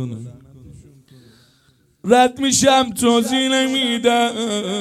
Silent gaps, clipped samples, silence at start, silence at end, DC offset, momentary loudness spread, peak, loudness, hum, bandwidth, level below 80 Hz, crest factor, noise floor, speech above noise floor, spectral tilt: none; under 0.1%; 0 s; 0 s; under 0.1%; 16 LU; 0 dBFS; -16 LUFS; none; 15.5 kHz; -54 dBFS; 18 dB; -58 dBFS; 41 dB; -3 dB/octave